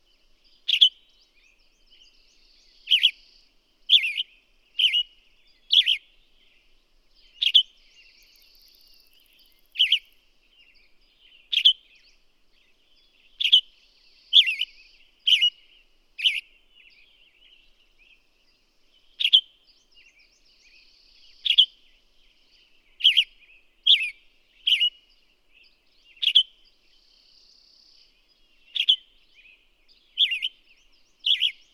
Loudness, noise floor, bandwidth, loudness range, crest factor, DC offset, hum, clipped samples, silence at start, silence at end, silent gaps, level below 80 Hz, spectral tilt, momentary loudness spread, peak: -20 LUFS; -64 dBFS; 15.5 kHz; 7 LU; 24 dB; under 0.1%; none; under 0.1%; 0.7 s; 0.25 s; none; -66 dBFS; 4.5 dB/octave; 14 LU; -4 dBFS